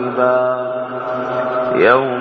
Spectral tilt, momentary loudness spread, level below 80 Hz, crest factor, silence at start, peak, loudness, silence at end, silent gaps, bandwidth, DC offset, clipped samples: -7.5 dB/octave; 10 LU; -56 dBFS; 16 dB; 0 s; 0 dBFS; -16 LUFS; 0 s; none; 6 kHz; under 0.1%; under 0.1%